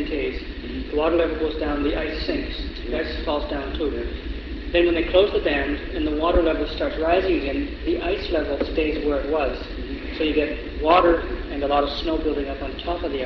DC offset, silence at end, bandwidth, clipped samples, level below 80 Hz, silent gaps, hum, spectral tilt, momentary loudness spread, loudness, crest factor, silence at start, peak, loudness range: under 0.1%; 0 s; 6.2 kHz; under 0.1%; -32 dBFS; none; none; -7.5 dB/octave; 11 LU; -23 LUFS; 20 dB; 0 s; -2 dBFS; 4 LU